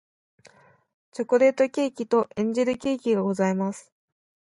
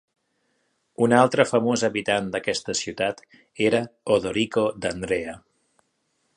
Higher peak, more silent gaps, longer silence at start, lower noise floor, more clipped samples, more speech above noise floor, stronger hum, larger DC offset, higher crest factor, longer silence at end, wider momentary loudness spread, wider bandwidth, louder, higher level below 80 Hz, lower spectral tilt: second, -8 dBFS vs -2 dBFS; neither; first, 1.15 s vs 1 s; second, -56 dBFS vs -72 dBFS; neither; second, 33 dB vs 49 dB; neither; neither; about the same, 18 dB vs 22 dB; second, 0.8 s vs 1 s; about the same, 11 LU vs 9 LU; about the same, 11.5 kHz vs 10.5 kHz; about the same, -24 LUFS vs -23 LUFS; second, -68 dBFS vs -58 dBFS; first, -6.5 dB/octave vs -4.5 dB/octave